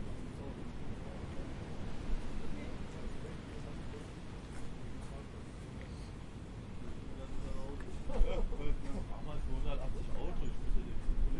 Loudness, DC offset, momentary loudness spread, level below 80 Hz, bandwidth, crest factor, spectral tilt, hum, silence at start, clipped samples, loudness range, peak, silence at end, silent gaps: -45 LUFS; under 0.1%; 7 LU; -40 dBFS; 10.5 kHz; 18 dB; -6.5 dB/octave; none; 0 s; under 0.1%; 6 LU; -18 dBFS; 0 s; none